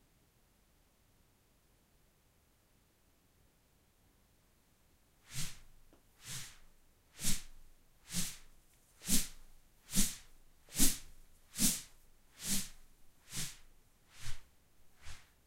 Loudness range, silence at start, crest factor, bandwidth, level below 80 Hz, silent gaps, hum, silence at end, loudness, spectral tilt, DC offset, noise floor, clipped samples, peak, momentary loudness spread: 15 LU; 5.3 s; 26 dB; 16 kHz; -48 dBFS; none; none; 0.3 s; -37 LUFS; -2 dB/octave; under 0.1%; -71 dBFS; under 0.1%; -14 dBFS; 23 LU